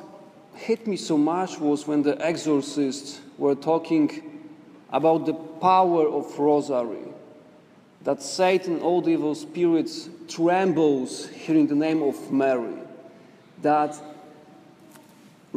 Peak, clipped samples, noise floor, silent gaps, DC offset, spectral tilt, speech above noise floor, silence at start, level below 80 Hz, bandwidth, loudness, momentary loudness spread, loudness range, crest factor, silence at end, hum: -8 dBFS; under 0.1%; -53 dBFS; none; under 0.1%; -5.5 dB/octave; 30 dB; 0 s; -76 dBFS; 12 kHz; -24 LUFS; 15 LU; 2 LU; 18 dB; 1.25 s; none